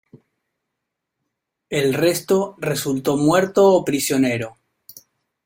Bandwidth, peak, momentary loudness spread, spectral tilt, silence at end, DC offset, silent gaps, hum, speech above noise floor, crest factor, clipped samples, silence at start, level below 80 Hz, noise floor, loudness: 16.5 kHz; -4 dBFS; 9 LU; -5 dB/octave; 0.95 s; under 0.1%; none; none; 62 dB; 18 dB; under 0.1%; 0.15 s; -58 dBFS; -80 dBFS; -19 LUFS